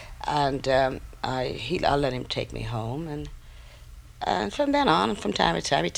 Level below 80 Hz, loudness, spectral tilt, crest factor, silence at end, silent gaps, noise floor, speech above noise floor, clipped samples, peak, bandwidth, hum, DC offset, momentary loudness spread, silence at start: -44 dBFS; -26 LUFS; -5 dB/octave; 22 dB; 0 s; none; -46 dBFS; 20 dB; under 0.1%; -4 dBFS; 16.5 kHz; none; under 0.1%; 11 LU; 0 s